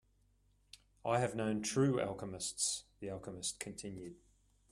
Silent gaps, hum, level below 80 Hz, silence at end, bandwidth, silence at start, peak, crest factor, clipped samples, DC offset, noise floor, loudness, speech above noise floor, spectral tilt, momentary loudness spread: none; none; -68 dBFS; 0.55 s; 14 kHz; 0.75 s; -20 dBFS; 20 dB; under 0.1%; under 0.1%; -73 dBFS; -38 LUFS; 35 dB; -4 dB/octave; 13 LU